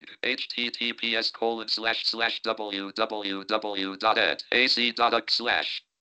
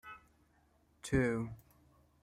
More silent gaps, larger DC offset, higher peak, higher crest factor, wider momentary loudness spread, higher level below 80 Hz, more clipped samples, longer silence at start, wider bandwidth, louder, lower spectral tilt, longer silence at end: neither; neither; first, -8 dBFS vs -20 dBFS; about the same, 20 dB vs 20 dB; second, 8 LU vs 23 LU; second, -70 dBFS vs -56 dBFS; neither; about the same, 0.05 s vs 0.05 s; second, 9 kHz vs 15.5 kHz; first, -26 LUFS vs -36 LUFS; second, -2.5 dB/octave vs -6.5 dB/octave; second, 0.3 s vs 0.65 s